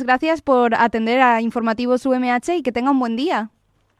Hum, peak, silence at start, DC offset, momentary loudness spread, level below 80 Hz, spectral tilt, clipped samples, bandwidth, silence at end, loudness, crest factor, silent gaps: none; -4 dBFS; 0 s; under 0.1%; 6 LU; -54 dBFS; -5 dB/octave; under 0.1%; 11.5 kHz; 0.5 s; -18 LUFS; 16 dB; none